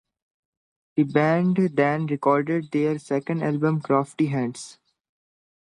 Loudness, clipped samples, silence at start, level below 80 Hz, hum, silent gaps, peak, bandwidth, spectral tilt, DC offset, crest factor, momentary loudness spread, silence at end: -23 LUFS; under 0.1%; 0.95 s; -70 dBFS; none; none; -6 dBFS; 11.5 kHz; -7.5 dB/octave; under 0.1%; 18 dB; 7 LU; 1.05 s